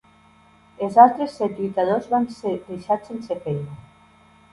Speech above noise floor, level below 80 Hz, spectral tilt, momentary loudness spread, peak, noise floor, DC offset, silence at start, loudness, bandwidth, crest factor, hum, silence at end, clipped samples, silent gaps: 33 dB; -60 dBFS; -7.5 dB/octave; 16 LU; 0 dBFS; -54 dBFS; under 0.1%; 0.8 s; -21 LUFS; 11.5 kHz; 22 dB; none; 0.75 s; under 0.1%; none